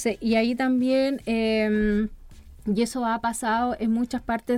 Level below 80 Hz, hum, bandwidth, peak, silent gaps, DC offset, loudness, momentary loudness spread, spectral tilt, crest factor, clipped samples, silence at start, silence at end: -46 dBFS; none; 15 kHz; -12 dBFS; none; under 0.1%; -24 LUFS; 5 LU; -5 dB/octave; 12 dB; under 0.1%; 0 s; 0 s